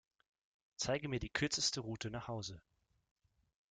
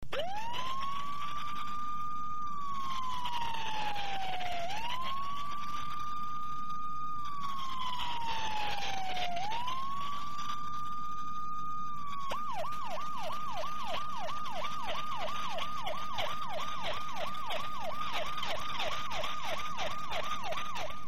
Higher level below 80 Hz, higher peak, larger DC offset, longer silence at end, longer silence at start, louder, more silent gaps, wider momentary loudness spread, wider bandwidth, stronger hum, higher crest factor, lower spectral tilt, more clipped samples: about the same, -62 dBFS vs -58 dBFS; about the same, -20 dBFS vs -18 dBFS; second, under 0.1% vs 3%; first, 1.1 s vs 0 s; first, 0.8 s vs 0 s; about the same, -39 LUFS vs -37 LUFS; neither; first, 14 LU vs 3 LU; second, 10 kHz vs 16 kHz; neither; first, 22 dB vs 16 dB; about the same, -3 dB/octave vs -3 dB/octave; neither